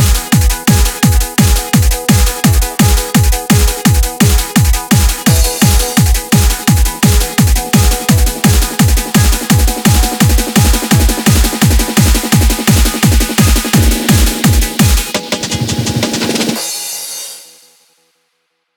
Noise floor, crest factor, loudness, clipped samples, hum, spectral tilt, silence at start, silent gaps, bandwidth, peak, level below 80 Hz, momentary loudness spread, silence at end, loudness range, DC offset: -65 dBFS; 10 dB; -11 LUFS; under 0.1%; none; -4 dB/octave; 0 s; none; over 20 kHz; 0 dBFS; -14 dBFS; 4 LU; 1.35 s; 3 LU; 0.3%